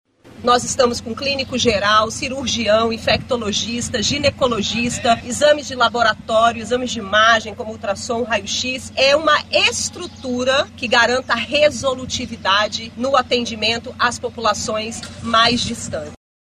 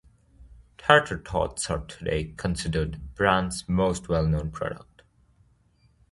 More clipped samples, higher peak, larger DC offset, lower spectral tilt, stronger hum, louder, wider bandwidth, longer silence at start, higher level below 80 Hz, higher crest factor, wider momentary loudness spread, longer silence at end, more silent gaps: neither; about the same, -2 dBFS vs 0 dBFS; neither; second, -2.5 dB/octave vs -5 dB/octave; neither; first, -17 LUFS vs -26 LUFS; first, 15 kHz vs 11.5 kHz; second, 0.25 s vs 0.4 s; second, -46 dBFS vs -40 dBFS; second, 16 dB vs 26 dB; second, 9 LU vs 12 LU; second, 0.35 s vs 1.35 s; neither